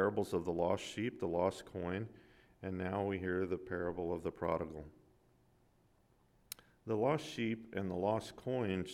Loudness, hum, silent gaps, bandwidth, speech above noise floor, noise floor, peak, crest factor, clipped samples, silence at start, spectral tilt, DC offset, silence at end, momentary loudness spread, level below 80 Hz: -39 LUFS; none; none; 17 kHz; 33 dB; -71 dBFS; -20 dBFS; 20 dB; under 0.1%; 0 s; -6.5 dB/octave; under 0.1%; 0 s; 13 LU; -66 dBFS